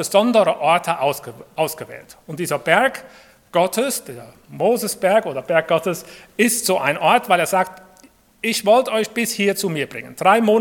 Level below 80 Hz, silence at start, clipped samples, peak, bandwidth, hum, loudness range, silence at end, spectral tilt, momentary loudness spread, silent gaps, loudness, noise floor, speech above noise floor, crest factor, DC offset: -64 dBFS; 0 s; under 0.1%; 0 dBFS; 18 kHz; none; 3 LU; 0 s; -3.5 dB/octave; 14 LU; none; -19 LUFS; -51 dBFS; 32 dB; 20 dB; under 0.1%